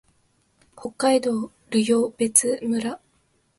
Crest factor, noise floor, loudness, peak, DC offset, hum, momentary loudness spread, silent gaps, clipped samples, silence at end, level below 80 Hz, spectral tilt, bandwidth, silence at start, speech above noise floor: 22 dB; -66 dBFS; -22 LUFS; -2 dBFS; under 0.1%; none; 16 LU; none; under 0.1%; 0.6 s; -66 dBFS; -3 dB/octave; 12 kHz; 0.75 s; 44 dB